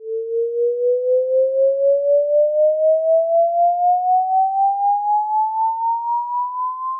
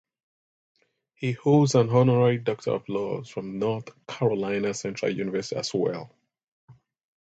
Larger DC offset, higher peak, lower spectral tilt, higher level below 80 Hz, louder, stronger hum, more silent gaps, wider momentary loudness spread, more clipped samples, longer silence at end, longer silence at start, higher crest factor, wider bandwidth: neither; about the same, -10 dBFS vs -8 dBFS; first, -9 dB/octave vs -6.5 dB/octave; second, under -90 dBFS vs -66 dBFS; first, -18 LUFS vs -25 LUFS; neither; second, none vs 6.48-6.68 s; second, 6 LU vs 13 LU; neither; second, 0 s vs 0.65 s; second, 0 s vs 1.2 s; second, 8 dB vs 20 dB; second, 1.2 kHz vs 8.2 kHz